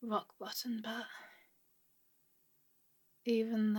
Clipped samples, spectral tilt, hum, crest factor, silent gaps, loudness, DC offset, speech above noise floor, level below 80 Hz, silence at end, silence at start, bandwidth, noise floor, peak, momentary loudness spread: under 0.1%; -5 dB/octave; none; 18 dB; none; -39 LUFS; under 0.1%; 36 dB; under -90 dBFS; 0 s; 0 s; 17.5 kHz; -73 dBFS; -22 dBFS; 16 LU